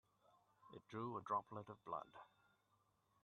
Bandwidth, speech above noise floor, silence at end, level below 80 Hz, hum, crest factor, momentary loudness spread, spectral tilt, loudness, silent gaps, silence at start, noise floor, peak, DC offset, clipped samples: 9 kHz; 33 dB; 0.95 s; -88 dBFS; none; 22 dB; 19 LU; -7.5 dB/octave; -49 LUFS; none; 0.6 s; -82 dBFS; -30 dBFS; under 0.1%; under 0.1%